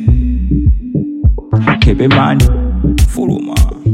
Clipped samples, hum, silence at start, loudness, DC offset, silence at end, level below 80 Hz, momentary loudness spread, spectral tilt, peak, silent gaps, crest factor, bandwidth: under 0.1%; none; 0 s; -12 LUFS; under 0.1%; 0 s; -14 dBFS; 6 LU; -6.5 dB/octave; 0 dBFS; none; 10 dB; 15 kHz